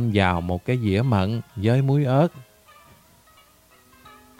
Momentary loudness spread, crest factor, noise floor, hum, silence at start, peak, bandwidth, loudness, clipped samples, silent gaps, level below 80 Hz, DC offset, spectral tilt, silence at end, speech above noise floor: 6 LU; 20 dB; -55 dBFS; none; 0 s; -4 dBFS; 15.5 kHz; -22 LUFS; under 0.1%; none; -50 dBFS; under 0.1%; -8 dB/octave; 1.95 s; 34 dB